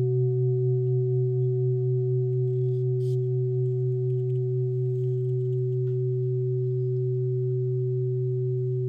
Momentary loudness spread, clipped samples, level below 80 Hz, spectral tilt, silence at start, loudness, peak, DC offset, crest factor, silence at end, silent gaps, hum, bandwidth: 2 LU; under 0.1%; -76 dBFS; -13 dB/octave; 0 s; -26 LUFS; -16 dBFS; under 0.1%; 8 dB; 0 s; none; none; 0.8 kHz